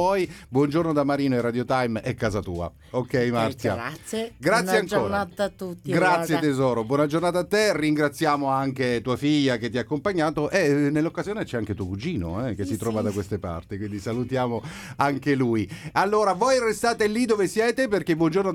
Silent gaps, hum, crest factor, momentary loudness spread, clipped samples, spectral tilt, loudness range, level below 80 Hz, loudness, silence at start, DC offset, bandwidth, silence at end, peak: none; none; 16 dB; 9 LU; under 0.1%; -5.5 dB/octave; 5 LU; -52 dBFS; -24 LUFS; 0 s; under 0.1%; 16.5 kHz; 0 s; -6 dBFS